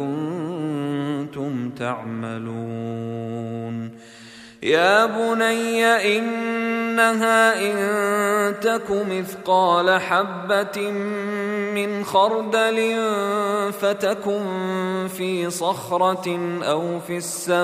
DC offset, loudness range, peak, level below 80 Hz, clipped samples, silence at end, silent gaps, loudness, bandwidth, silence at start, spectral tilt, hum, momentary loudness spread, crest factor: under 0.1%; 8 LU; -4 dBFS; -66 dBFS; under 0.1%; 0 s; none; -21 LUFS; 15.5 kHz; 0 s; -4.5 dB/octave; none; 12 LU; 18 dB